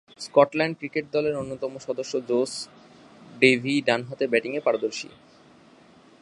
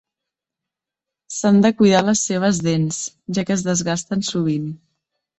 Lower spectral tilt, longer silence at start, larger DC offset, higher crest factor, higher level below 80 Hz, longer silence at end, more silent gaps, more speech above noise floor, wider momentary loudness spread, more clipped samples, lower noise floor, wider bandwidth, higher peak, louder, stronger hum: about the same, -4.5 dB/octave vs -5 dB/octave; second, 0.2 s vs 1.3 s; neither; first, 24 dB vs 18 dB; second, -68 dBFS vs -56 dBFS; first, 1.15 s vs 0.65 s; neither; second, 29 dB vs 68 dB; about the same, 13 LU vs 12 LU; neither; second, -53 dBFS vs -86 dBFS; first, 11.5 kHz vs 8.4 kHz; about the same, -2 dBFS vs -2 dBFS; second, -25 LUFS vs -19 LUFS; neither